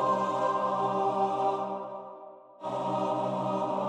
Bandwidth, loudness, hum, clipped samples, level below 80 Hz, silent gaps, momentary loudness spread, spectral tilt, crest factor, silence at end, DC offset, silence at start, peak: 10 kHz; -30 LUFS; none; under 0.1%; -76 dBFS; none; 14 LU; -6.5 dB/octave; 14 dB; 0 s; under 0.1%; 0 s; -16 dBFS